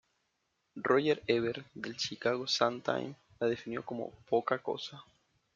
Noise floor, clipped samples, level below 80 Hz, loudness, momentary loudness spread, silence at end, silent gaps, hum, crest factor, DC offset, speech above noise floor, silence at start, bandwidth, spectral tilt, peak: -80 dBFS; under 0.1%; -74 dBFS; -33 LUFS; 12 LU; 0.55 s; none; none; 24 dB; under 0.1%; 47 dB; 0.75 s; 7.6 kHz; -4.5 dB/octave; -12 dBFS